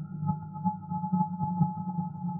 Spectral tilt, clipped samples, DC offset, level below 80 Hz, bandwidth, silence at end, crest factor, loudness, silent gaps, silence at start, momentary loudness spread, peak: -15 dB/octave; under 0.1%; under 0.1%; -66 dBFS; 1.5 kHz; 0 s; 16 dB; -32 LUFS; none; 0 s; 5 LU; -14 dBFS